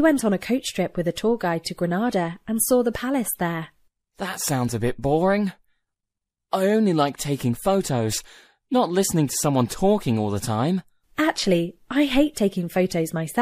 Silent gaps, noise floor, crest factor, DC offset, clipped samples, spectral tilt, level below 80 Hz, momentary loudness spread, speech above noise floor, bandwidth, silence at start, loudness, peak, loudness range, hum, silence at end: none; -84 dBFS; 18 dB; under 0.1%; under 0.1%; -5 dB/octave; -48 dBFS; 7 LU; 62 dB; 15.5 kHz; 0 s; -23 LUFS; -6 dBFS; 2 LU; none; 0 s